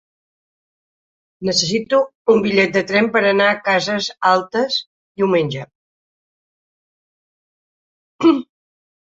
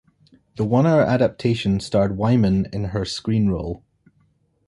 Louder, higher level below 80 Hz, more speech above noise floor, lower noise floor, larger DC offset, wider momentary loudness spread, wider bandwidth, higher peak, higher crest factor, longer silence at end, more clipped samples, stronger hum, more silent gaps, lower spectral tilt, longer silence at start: first, -17 LUFS vs -20 LUFS; second, -60 dBFS vs -42 dBFS; first, over 74 dB vs 43 dB; first, under -90 dBFS vs -63 dBFS; neither; second, 7 LU vs 10 LU; second, 7.8 kHz vs 11.5 kHz; first, 0 dBFS vs -6 dBFS; about the same, 18 dB vs 16 dB; second, 0.7 s vs 0.9 s; neither; neither; first, 2.15-2.25 s, 4.87-5.15 s, 5.75-8.19 s vs none; second, -4 dB/octave vs -7.5 dB/octave; first, 1.4 s vs 0.55 s